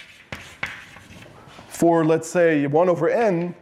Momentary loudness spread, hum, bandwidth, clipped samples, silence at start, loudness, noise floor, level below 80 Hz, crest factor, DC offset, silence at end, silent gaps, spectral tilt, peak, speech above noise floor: 19 LU; none; 14.5 kHz; under 0.1%; 0.3 s; -20 LUFS; -44 dBFS; -60 dBFS; 14 dB; under 0.1%; 0.1 s; none; -6.5 dB/octave; -8 dBFS; 25 dB